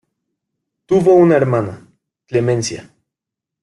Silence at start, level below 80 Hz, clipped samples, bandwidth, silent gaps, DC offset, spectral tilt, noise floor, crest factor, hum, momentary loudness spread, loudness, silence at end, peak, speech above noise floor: 0.9 s; -54 dBFS; under 0.1%; 11.5 kHz; none; under 0.1%; -6.5 dB/octave; -84 dBFS; 16 dB; none; 15 LU; -15 LUFS; 0.8 s; -2 dBFS; 70 dB